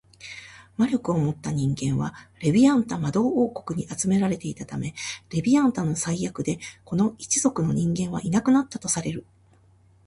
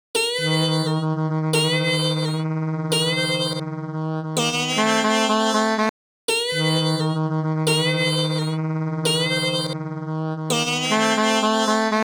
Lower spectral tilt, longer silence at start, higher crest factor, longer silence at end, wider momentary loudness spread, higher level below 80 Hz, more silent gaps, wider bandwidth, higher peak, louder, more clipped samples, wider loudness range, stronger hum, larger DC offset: first, -5.5 dB/octave vs -4 dB/octave; about the same, 0.2 s vs 0.15 s; about the same, 16 dB vs 16 dB; first, 0.85 s vs 0.1 s; first, 12 LU vs 7 LU; first, -54 dBFS vs -70 dBFS; second, none vs 5.89-6.28 s; second, 11.5 kHz vs over 20 kHz; second, -8 dBFS vs -4 dBFS; second, -24 LUFS vs -21 LUFS; neither; about the same, 2 LU vs 1 LU; neither; neither